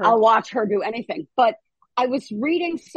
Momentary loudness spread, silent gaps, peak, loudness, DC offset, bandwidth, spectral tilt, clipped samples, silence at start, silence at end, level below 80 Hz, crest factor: 11 LU; none; -6 dBFS; -21 LUFS; under 0.1%; 9 kHz; -5.5 dB/octave; under 0.1%; 0 s; 0.2 s; -70 dBFS; 16 dB